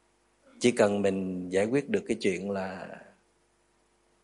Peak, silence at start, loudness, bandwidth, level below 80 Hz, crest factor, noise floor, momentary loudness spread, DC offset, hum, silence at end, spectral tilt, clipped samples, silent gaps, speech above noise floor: -10 dBFS; 0.55 s; -29 LUFS; 11.5 kHz; -70 dBFS; 22 dB; -69 dBFS; 15 LU; under 0.1%; 50 Hz at -60 dBFS; 1.2 s; -5.5 dB/octave; under 0.1%; none; 41 dB